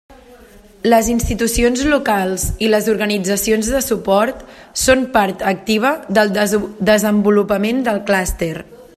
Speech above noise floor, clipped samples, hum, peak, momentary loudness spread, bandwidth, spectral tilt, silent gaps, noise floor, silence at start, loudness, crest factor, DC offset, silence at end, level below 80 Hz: 27 dB; under 0.1%; none; 0 dBFS; 6 LU; 15 kHz; -4 dB/octave; none; -43 dBFS; 0.1 s; -16 LUFS; 16 dB; under 0.1%; 0.15 s; -32 dBFS